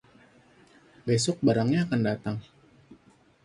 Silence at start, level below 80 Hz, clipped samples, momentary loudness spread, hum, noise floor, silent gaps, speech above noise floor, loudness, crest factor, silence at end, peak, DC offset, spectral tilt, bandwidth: 1.05 s; -60 dBFS; under 0.1%; 13 LU; none; -60 dBFS; none; 34 dB; -27 LUFS; 20 dB; 0.5 s; -10 dBFS; under 0.1%; -5.5 dB/octave; 11.5 kHz